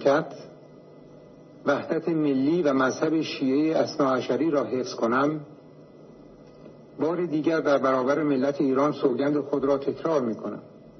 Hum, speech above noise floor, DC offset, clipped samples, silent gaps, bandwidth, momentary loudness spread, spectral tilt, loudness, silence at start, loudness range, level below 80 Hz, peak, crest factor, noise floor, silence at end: none; 24 dB; under 0.1%; under 0.1%; none; 6.4 kHz; 8 LU; -6.5 dB/octave; -25 LUFS; 0 s; 4 LU; -68 dBFS; -8 dBFS; 16 dB; -48 dBFS; 0.1 s